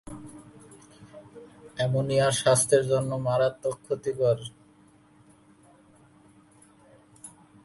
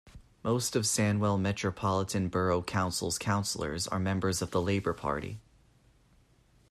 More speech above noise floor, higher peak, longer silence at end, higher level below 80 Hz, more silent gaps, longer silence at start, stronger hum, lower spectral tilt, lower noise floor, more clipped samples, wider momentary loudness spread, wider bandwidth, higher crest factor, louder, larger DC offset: about the same, 33 dB vs 34 dB; first, -8 dBFS vs -16 dBFS; second, 0.35 s vs 1.3 s; second, -62 dBFS vs -56 dBFS; neither; about the same, 0.05 s vs 0.05 s; neither; about the same, -4.5 dB/octave vs -4.5 dB/octave; second, -58 dBFS vs -64 dBFS; neither; first, 26 LU vs 6 LU; second, 12 kHz vs 14.5 kHz; about the same, 20 dB vs 16 dB; first, -25 LUFS vs -31 LUFS; neither